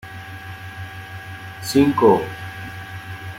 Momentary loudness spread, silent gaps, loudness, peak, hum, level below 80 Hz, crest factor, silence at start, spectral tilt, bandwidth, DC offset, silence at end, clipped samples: 19 LU; none; -18 LUFS; -2 dBFS; none; -54 dBFS; 20 dB; 0.05 s; -6 dB/octave; 16 kHz; under 0.1%; 0 s; under 0.1%